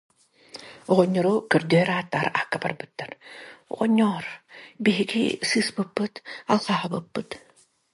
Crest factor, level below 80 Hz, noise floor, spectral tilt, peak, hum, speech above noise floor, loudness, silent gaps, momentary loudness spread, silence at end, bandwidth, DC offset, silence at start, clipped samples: 20 dB; -66 dBFS; -47 dBFS; -5.5 dB/octave; -4 dBFS; none; 23 dB; -24 LUFS; none; 20 LU; 0.55 s; 11.5 kHz; under 0.1%; 0.55 s; under 0.1%